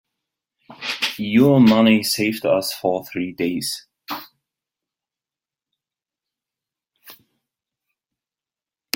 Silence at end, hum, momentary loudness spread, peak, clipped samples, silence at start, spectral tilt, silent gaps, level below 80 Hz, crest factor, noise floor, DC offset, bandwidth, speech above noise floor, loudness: 1.8 s; none; 19 LU; 0 dBFS; under 0.1%; 0.7 s; -5 dB/octave; none; -62 dBFS; 22 dB; under -90 dBFS; under 0.1%; 17 kHz; over 73 dB; -18 LUFS